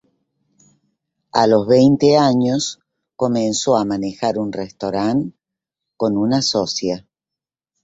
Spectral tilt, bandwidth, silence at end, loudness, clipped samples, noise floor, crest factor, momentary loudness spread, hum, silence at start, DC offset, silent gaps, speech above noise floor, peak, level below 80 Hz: -5 dB/octave; 8 kHz; 0.85 s; -17 LUFS; under 0.1%; -87 dBFS; 18 dB; 12 LU; none; 1.35 s; under 0.1%; none; 71 dB; 0 dBFS; -56 dBFS